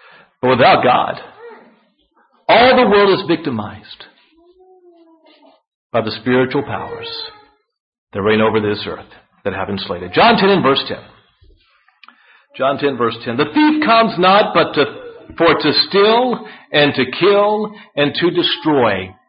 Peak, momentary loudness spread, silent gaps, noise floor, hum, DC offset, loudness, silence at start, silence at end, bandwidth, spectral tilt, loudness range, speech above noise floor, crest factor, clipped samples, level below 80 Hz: 0 dBFS; 15 LU; 5.67-5.90 s, 7.80-7.92 s, 7.98-8.07 s; -58 dBFS; none; under 0.1%; -14 LUFS; 0.45 s; 0.15 s; 5.4 kHz; -10.5 dB/octave; 8 LU; 43 dB; 16 dB; under 0.1%; -52 dBFS